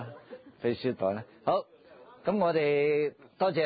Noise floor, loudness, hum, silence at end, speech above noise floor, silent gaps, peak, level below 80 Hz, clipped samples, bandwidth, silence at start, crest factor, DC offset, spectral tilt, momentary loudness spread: -54 dBFS; -30 LUFS; none; 0 s; 26 dB; none; -16 dBFS; -70 dBFS; under 0.1%; 5 kHz; 0 s; 14 dB; under 0.1%; -10 dB/octave; 11 LU